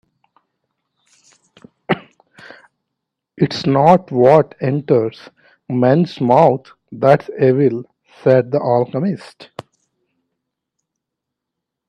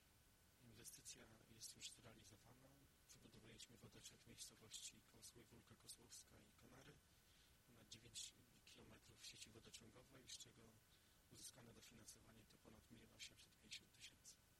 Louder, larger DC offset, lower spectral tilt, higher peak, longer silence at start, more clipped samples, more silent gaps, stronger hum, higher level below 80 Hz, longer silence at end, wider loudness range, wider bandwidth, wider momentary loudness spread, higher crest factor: first, -15 LUFS vs -62 LUFS; neither; first, -8 dB/octave vs -2 dB/octave; first, 0 dBFS vs -42 dBFS; first, 1.9 s vs 0 s; neither; neither; neither; first, -60 dBFS vs -82 dBFS; first, 2.3 s vs 0 s; first, 10 LU vs 3 LU; second, 9.8 kHz vs 16.5 kHz; about the same, 13 LU vs 12 LU; second, 18 dB vs 24 dB